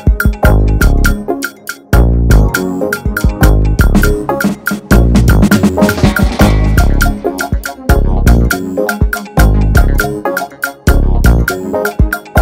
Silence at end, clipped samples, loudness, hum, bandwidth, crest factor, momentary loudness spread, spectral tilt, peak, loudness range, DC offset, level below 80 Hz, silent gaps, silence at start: 0 s; 0.2%; -12 LUFS; none; 16.5 kHz; 10 dB; 8 LU; -6 dB/octave; 0 dBFS; 2 LU; under 0.1%; -12 dBFS; none; 0 s